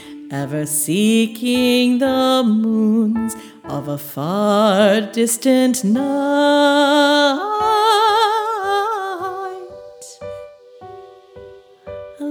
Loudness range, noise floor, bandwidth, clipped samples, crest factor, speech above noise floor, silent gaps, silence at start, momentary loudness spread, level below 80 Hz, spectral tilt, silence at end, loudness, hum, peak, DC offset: 10 LU; -40 dBFS; over 20 kHz; under 0.1%; 16 dB; 25 dB; none; 0 s; 19 LU; -58 dBFS; -4 dB/octave; 0 s; -16 LUFS; none; -2 dBFS; under 0.1%